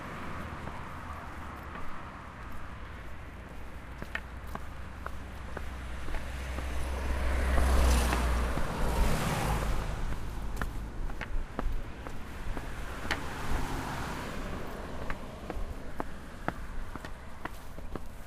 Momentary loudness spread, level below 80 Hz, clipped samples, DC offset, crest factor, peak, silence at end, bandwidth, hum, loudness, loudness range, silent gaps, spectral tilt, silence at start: 14 LU; -36 dBFS; under 0.1%; under 0.1%; 22 dB; -12 dBFS; 0 s; 15.5 kHz; none; -37 LUFS; 12 LU; none; -5 dB/octave; 0 s